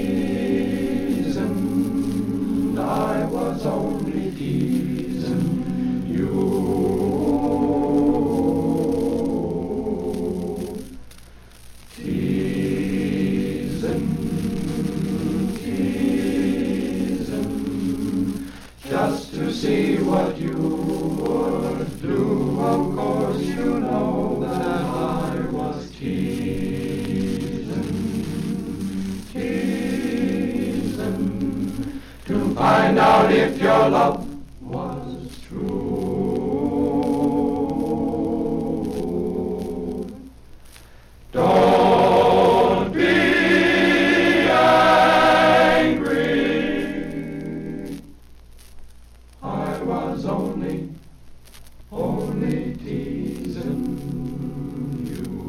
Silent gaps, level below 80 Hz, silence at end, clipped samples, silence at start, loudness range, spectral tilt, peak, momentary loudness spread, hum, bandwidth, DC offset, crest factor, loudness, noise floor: none; -42 dBFS; 0 s; under 0.1%; 0 s; 11 LU; -6.5 dB/octave; -6 dBFS; 14 LU; none; 15.5 kHz; under 0.1%; 16 dB; -21 LUFS; -45 dBFS